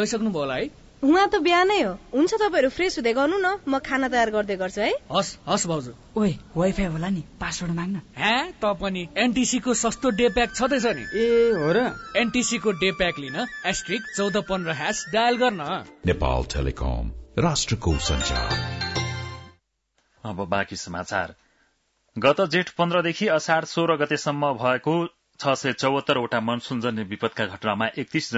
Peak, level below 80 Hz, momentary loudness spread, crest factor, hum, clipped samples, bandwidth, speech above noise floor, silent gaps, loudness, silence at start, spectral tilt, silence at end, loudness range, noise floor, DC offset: -6 dBFS; -40 dBFS; 8 LU; 18 dB; none; under 0.1%; 8 kHz; 47 dB; none; -24 LUFS; 0 s; -4.5 dB/octave; 0 s; 5 LU; -71 dBFS; under 0.1%